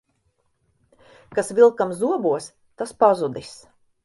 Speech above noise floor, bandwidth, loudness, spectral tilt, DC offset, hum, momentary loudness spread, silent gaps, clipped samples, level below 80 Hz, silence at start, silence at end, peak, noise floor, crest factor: 49 dB; 11.5 kHz; -20 LUFS; -5.5 dB/octave; under 0.1%; none; 18 LU; none; under 0.1%; -64 dBFS; 1.3 s; 0.5 s; -2 dBFS; -69 dBFS; 20 dB